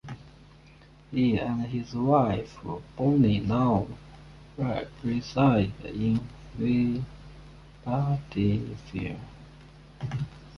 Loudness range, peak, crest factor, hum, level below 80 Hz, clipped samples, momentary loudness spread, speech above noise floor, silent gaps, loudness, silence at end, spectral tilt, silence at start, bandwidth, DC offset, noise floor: 5 LU; -10 dBFS; 18 dB; none; -48 dBFS; under 0.1%; 18 LU; 26 dB; none; -28 LUFS; 0 s; -8.5 dB/octave; 0.05 s; 6.8 kHz; under 0.1%; -53 dBFS